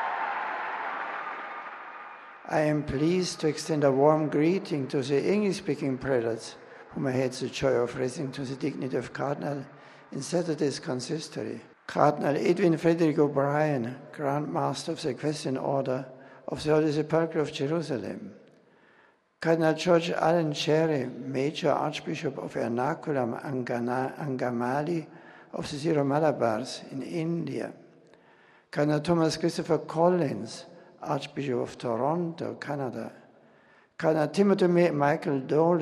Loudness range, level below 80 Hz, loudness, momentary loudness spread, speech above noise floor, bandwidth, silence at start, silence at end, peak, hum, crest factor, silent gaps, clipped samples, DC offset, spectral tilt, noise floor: 5 LU; -64 dBFS; -28 LUFS; 13 LU; 35 dB; 12.5 kHz; 0 s; 0 s; -6 dBFS; none; 22 dB; none; under 0.1%; under 0.1%; -6 dB/octave; -62 dBFS